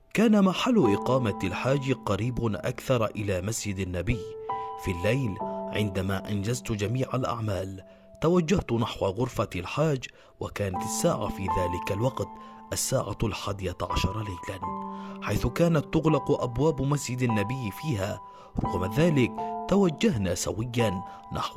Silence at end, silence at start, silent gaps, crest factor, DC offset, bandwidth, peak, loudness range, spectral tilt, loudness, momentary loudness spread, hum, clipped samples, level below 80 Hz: 0 s; 0.15 s; none; 16 dB; under 0.1%; 16 kHz; -10 dBFS; 3 LU; -6 dB/octave; -28 LUFS; 11 LU; none; under 0.1%; -46 dBFS